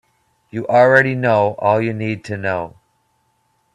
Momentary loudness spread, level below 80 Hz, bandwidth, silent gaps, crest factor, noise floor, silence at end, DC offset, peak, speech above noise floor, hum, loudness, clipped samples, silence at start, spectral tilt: 15 LU; -58 dBFS; 10 kHz; none; 18 dB; -64 dBFS; 1.05 s; under 0.1%; 0 dBFS; 48 dB; none; -16 LUFS; under 0.1%; 0.55 s; -7.5 dB/octave